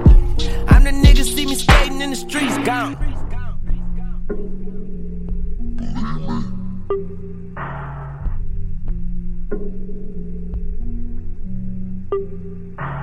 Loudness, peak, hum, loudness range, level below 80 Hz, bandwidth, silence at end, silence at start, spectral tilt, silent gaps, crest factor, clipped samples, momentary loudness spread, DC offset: -22 LUFS; 0 dBFS; none; 13 LU; -18 dBFS; 14.5 kHz; 0 s; 0 s; -5.5 dB/octave; none; 16 dB; under 0.1%; 18 LU; under 0.1%